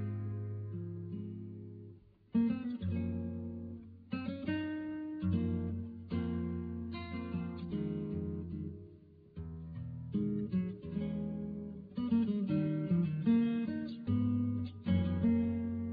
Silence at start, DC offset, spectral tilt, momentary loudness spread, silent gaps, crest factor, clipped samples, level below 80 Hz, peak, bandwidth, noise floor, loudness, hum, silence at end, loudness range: 0 s; under 0.1%; -11 dB/octave; 14 LU; none; 16 dB; under 0.1%; -58 dBFS; -20 dBFS; 4.9 kHz; -58 dBFS; -37 LUFS; none; 0 s; 7 LU